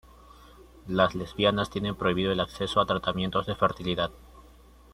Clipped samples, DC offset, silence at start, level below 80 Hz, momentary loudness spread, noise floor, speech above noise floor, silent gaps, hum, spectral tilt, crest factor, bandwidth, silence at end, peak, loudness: under 0.1%; under 0.1%; 0.6 s; -50 dBFS; 5 LU; -53 dBFS; 26 dB; none; none; -6 dB/octave; 20 dB; 14.5 kHz; 0.55 s; -8 dBFS; -27 LUFS